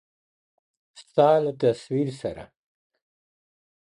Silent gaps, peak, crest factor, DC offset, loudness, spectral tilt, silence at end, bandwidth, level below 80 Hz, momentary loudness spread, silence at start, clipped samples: none; -6 dBFS; 20 dB; under 0.1%; -24 LUFS; -7 dB/octave; 1.55 s; 11 kHz; -64 dBFS; 15 LU; 1 s; under 0.1%